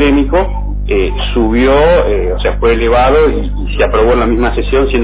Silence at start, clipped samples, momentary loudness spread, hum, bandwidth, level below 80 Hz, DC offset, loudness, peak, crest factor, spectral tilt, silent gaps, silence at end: 0 s; under 0.1%; 7 LU; 50 Hz at -15 dBFS; 4 kHz; -16 dBFS; under 0.1%; -11 LUFS; 0 dBFS; 10 dB; -10.5 dB/octave; none; 0 s